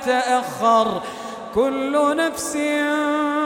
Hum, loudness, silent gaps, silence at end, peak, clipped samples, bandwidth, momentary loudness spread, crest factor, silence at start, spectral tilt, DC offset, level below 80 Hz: none; -20 LUFS; none; 0 s; -4 dBFS; under 0.1%; 17.5 kHz; 8 LU; 16 dB; 0 s; -3.5 dB/octave; under 0.1%; -56 dBFS